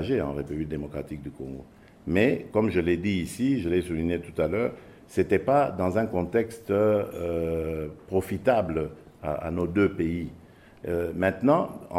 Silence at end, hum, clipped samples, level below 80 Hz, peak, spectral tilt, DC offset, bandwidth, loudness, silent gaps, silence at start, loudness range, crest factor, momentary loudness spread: 0 s; none; under 0.1%; -52 dBFS; -8 dBFS; -7.5 dB/octave; under 0.1%; 16 kHz; -27 LUFS; none; 0 s; 2 LU; 18 dB; 13 LU